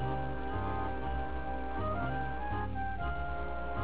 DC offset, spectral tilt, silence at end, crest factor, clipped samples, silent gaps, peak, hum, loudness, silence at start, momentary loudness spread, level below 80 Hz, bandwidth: 1%; -6 dB/octave; 0 s; 12 dB; under 0.1%; none; -22 dBFS; none; -37 LUFS; 0 s; 3 LU; -42 dBFS; 4 kHz